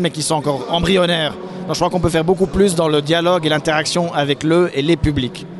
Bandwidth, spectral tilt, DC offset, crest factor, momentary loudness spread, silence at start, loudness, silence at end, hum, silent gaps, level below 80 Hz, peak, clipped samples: 12 kHz; -5 dB/octave; under 0.1%; 14 dB; 5 LU; 0 s; -16 LUFS; 0 s; none; none; -36 dBFS; -2 dBFS; under 0.1%